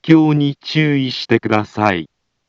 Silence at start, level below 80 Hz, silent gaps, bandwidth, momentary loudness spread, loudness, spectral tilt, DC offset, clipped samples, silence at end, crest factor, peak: 0.05 s; -58 dBFS; none; 7.2 kHz; 7 LU; -16 LUFS; -7 dB/octave; under 0.1%; under 0.1%; 0.45 s; 16 dB; 0 dBFS